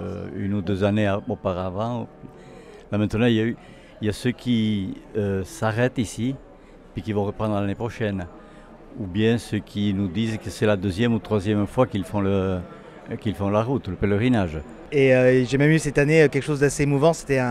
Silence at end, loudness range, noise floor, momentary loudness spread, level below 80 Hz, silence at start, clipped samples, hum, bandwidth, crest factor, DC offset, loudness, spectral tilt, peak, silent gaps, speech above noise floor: 0 s; 7 LU; -45 dBFS; 12 LU; -48 dBFS; 0 s; under 0.1%; none; 13.5 kHz; 18 dB; under 0.1%; -23 LUFS; -6.5 dB/octave; -4 dBFS; none; 23 dB